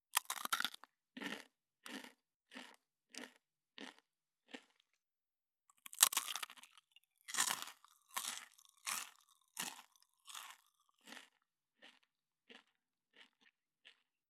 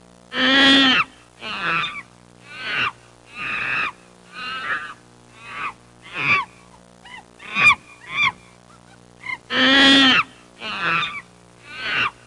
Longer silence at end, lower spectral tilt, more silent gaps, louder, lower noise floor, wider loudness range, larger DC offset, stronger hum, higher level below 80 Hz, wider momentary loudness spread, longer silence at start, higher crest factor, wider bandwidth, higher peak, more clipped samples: first, 0.4 s vs 0.15 s; second, 1.5 dB/octave vs -2.5 dB/octave; first, 2.36-2.40 s vs none; second, -40 LUFS vs -17 LUFS; first, under -90 dBFS vs -48 dBFS; first, 20 LU vs 9 LU; neither; second, none vs 60 Hz at -55 dBFS; second, under -90 dBFS vs -58 dBFS; about the same, 23 LU vs 23 LU; second, 0.15 s vs 0.3 s; first, 42 dB vs 18 dB; first, 18 kHz vs 11.5 kHz; about the same, -6 dBFS vs -4 dBFS; neither